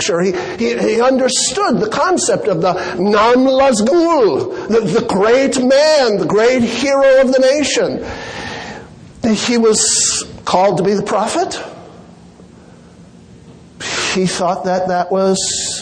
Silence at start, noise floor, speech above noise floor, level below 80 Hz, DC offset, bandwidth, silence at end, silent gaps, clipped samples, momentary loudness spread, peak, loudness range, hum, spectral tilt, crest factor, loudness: 0 s; -40 dBFS; 27 dB; -46 dBFS; under 0.1%; 10 kHz; 0 s; none; under 0.1%; 11 LU; 0 dBFS; 8 LU; none; -3.5 dB/octave; 14 dB; -13 LUFS